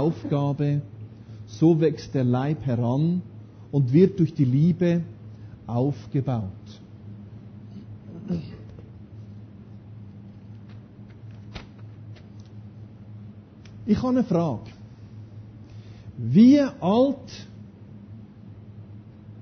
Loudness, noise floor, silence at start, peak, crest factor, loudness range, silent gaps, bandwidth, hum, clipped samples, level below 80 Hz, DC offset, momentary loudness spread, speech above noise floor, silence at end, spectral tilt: -23 LUFS; -44 dBFS; 0 s; -6 dBFS; 20 dB; 21 LU; none; 6.6 kHz; none; under 0.1%; -54 dBFS; under 0.1%; 24 LU; 23 dB; 0 s; -9 dB/octave